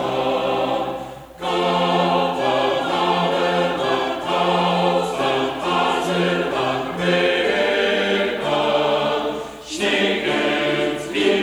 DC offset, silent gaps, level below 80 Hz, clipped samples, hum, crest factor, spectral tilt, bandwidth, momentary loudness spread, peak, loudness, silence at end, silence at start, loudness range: under 0.1%; none; -52 dBFS; under 0.1%; none; 14 dB; -4.5 dB/octave; over 20 kHz; 5 LU; -6 dBFS; -20 LUFS; 0 s; 0 s; 1 LU